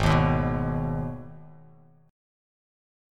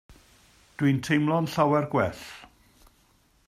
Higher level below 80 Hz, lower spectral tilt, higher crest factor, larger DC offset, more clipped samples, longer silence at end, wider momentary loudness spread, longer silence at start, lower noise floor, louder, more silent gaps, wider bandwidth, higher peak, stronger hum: first, -38 dBFS vs -60 dBFS; about the same, -7.5 dB/octave vs -6.5 dB/octave; about the same, 20 dB vs 20 dB; neither; neither; first, 1.6 s vs 1 s; first, 23 LU vs 20 LU; about the same, 0 s vs 0.1 s; second, -54 dBFS vs -63 dBFS; about the same, -26 LUFS vs -25 LUFS; neither; second, 11 kHz vs 15.5 kHz; about the same, -8 dBFS vs -8 dBFS; neither